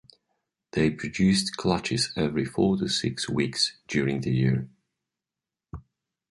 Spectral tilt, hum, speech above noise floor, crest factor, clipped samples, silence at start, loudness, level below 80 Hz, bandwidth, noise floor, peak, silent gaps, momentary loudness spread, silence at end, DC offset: -5 dB/octave; none; 64 dB; 20 dB; under 0.1%; 0.75 s; -26 LUFS; -52 dBFS; 11.5 kHz; -89 dBFS; -8 dBFS; none; 14 LU; 0.5 s; under 0.1%